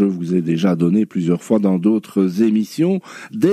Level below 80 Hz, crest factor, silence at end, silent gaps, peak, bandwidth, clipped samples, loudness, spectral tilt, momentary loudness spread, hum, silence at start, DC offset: -62 dBFS; 14 dB; 0 s; none; -2 dBFS; 14 kHz; under 0.1%; -18 LUFS; -8 dB/octave; 4 LU; none; 0 s; under 0.1%